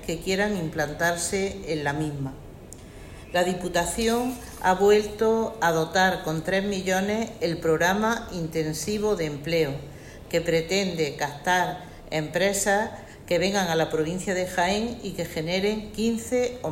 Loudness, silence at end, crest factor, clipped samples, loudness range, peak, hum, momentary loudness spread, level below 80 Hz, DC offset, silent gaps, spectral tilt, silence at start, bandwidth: -25 LUFS; 0 s; 18 dB; under 0.1%; 4 LU; -8 dBFS; none; 9 LU; -48 dBFS; under 0.1%; none; -4 dB/octave; 0 s; 16.5 kHz